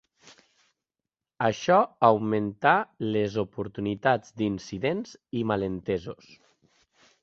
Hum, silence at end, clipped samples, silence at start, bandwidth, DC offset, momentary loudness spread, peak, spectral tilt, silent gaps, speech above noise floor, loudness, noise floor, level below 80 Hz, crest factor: none; 1.1 s; under 0.1%; 1.4 s; 7.8 kHz; under 0.1%; 10 LU; -4 dBFS; -6.5 dB/octave; none; 63 dB; -26 LUFS; -89 dBFS; -60 dBFS; 22 dB